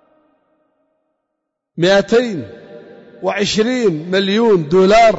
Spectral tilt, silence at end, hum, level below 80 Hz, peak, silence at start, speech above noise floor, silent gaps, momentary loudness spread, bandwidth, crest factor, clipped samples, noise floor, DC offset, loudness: -5 dB/octave; 0 s; none; -46 dBFS; -4 dBFS; 1.8 s; 63 dB; none; 13 LU; 8 kHz; 12 dB; under 0.1%; -76 dBFS; under 0.1%; -14 LUFS